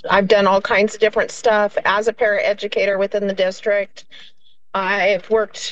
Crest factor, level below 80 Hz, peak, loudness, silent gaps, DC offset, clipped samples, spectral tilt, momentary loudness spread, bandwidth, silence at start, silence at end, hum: 16 dB; -52 dBFS; -2 dBFS; -18 LUFS; none; 0.9%; under 0.1%; -4 dB/octave; 6 LU; 8.6 kHz; 0.05 s; 0 s; none